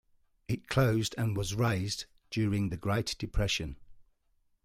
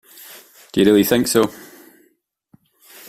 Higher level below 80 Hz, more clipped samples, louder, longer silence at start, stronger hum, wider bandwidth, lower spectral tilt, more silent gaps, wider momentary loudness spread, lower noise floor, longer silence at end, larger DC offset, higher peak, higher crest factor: first, -46 dBFS vs -54 dBFS; neither; second, -32 LUFS vs -16 LUFS; first, 0.5 s vs 0.3 s; neither; about the same, 16 kHz vs 16 kHz; about the same, -5 dB/octave vs -4.5 dB/octave; neither; second, 9 LU vs 25 LU; first, -72 dBFS vs -63 dBFS; second, 0.6 s vs 1.5 s; neither; second, -14 dBFS vs -2 dBFS; about the same, 18 dB vs 18 dB